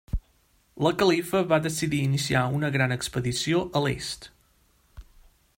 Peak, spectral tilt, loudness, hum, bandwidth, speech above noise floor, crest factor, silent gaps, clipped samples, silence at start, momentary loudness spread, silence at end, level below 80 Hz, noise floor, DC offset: -8 dBFS; -5 dB/octave; -25 LUFS; none; 16.5 kHz; 39 dB; 20 dB; none; under 0.1%; 0.1 s; 10 LU; 0.55 s; -44 dBFS; -64 dBFS; under 0.1%